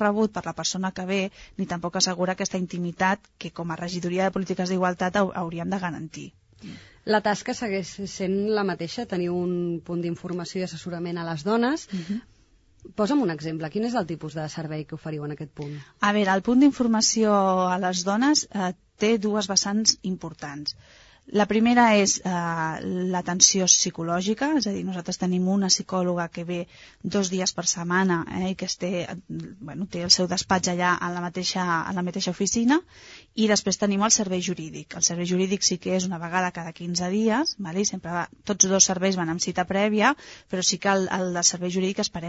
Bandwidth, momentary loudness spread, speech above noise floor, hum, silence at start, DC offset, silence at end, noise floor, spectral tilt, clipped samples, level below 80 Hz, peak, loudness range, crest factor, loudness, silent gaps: 8 kHz; 14 LU; 34 dB; none; 0 s; under 0.1%; 0 s; -58 dBFS; -3.5 dB/octave; under 0.1%; -58 dBFS; 0 dBFS; 7 LU; 24 dB; -24 LUFS; none